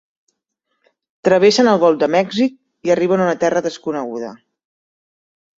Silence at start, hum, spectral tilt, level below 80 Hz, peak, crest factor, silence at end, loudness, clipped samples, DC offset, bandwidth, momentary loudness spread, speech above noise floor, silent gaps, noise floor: 1.25 s; none; -5 dB/octave; -62 dBFS; -2 dBFS; 16 dB; 1.25 s; -16 LUFS; under 0.1%; under 0.1%; 7.8 kHz; 13 LU; 58 dB; none; -73 dBFS